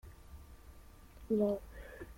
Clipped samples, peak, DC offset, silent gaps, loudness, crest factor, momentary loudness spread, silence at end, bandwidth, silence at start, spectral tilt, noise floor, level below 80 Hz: under 0.1%; -22 dBFS; under 0.1%; none; -35 LUFS; 18 dB; 26 LU; 0.05 s; 16.5 kHz; 0.05 s; -8 dB/octave; -56 dBFS; -56 dBFS